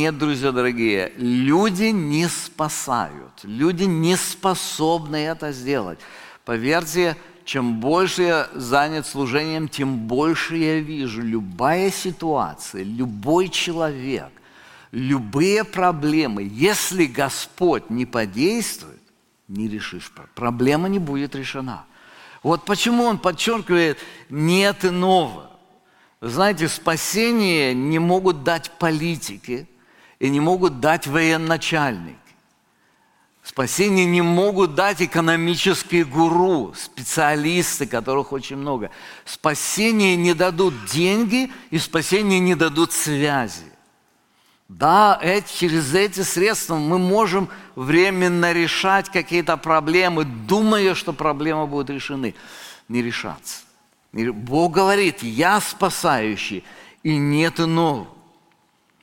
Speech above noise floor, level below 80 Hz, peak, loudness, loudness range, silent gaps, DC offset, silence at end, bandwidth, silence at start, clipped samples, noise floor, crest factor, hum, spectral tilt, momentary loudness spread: 41 dB; -52 dBFS; -2 dBFS; -20 LUFS; 5 LU; none; under 0.1%; 0.9 s; 17 kHz; 0 s; under 0.1%; -61 dBFS; 18 dB; none; -4.5 dB/octave; 12 LU